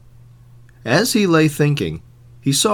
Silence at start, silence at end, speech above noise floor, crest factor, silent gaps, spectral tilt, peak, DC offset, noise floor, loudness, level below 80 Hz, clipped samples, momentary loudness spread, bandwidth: 0.85 s; 0 s; 29 dB; 18 dB; none; -4.5 dB/octave; 0 dBFS; under 0.1%; -45 dBFS; -17 LUFS; -48 dBFS; under 0.1%; 13 LU; 19 kHz